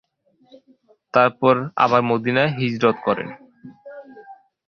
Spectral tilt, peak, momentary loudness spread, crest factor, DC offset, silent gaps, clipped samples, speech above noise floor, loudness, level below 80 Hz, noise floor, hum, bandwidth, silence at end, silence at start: -7 dB/octave; 0 dBFS; 23 LU; 22 dB; under 0.1%; none; under 0.1%; 40 dB; -19 LUFS; -62 dBFS; -59 dBFS; none; 6.8 kHz; 0.35 s; 1.15 s